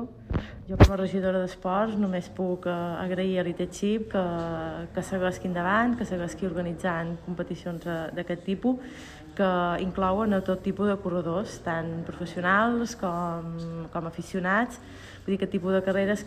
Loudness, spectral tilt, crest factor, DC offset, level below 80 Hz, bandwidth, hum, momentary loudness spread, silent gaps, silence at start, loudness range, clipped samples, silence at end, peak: -28 LUFS; -6.5 dB/octave; 24 dB; under 0.1%; -40 dBFS; 14.5 kHz; none; 10 LU; none; 0 s; 3 LU; under 0.1%; 0 s; -4 dBFS